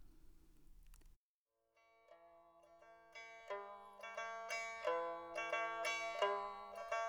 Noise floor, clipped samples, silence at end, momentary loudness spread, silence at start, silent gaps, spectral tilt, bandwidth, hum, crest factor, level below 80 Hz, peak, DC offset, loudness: under -90 dBFS; under 0.1%; 0 s; 16 LU; 0 s; 1.16-1.46 s; -1 dB/octave; over 20 kHz; none; 22 dB; -72 dBFS; -24 dBFS; under 0.1%; -44 LUFS